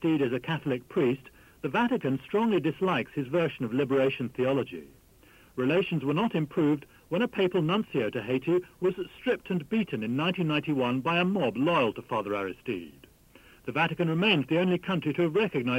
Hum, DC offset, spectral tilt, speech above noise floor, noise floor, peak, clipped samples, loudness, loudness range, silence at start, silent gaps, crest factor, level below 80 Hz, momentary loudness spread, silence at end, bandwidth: none; under 0.1%; -7.5 dB/octave; 29 dB; -57 dBFS; -12 dBFS; under 0.1%; -28 LUFS; 1 LU; 0 s; none; 16 dB; -62 dBFS; 7 LU; 0 s; 16 kHz